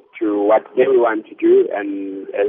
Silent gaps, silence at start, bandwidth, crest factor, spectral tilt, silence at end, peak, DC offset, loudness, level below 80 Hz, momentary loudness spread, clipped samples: none; 0.15 s; 3.7 kHz; 14 dB; -4 dB/octave; 0 s; -4 dBFS; under 0.1%; -17 LUFS; -72 dBFS; 11 LU; under 0.1%